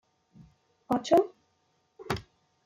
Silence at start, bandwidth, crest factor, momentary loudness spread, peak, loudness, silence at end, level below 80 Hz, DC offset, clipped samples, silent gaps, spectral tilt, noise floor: 0.9 s; 16 kHz; 22 dB; 13 LU; -10 dBFS; -29 LUFS; 0.45 s; -60 dBFS; under 0.1%; under 0.1%; none; -5.5 dB/octave; -73 dBFS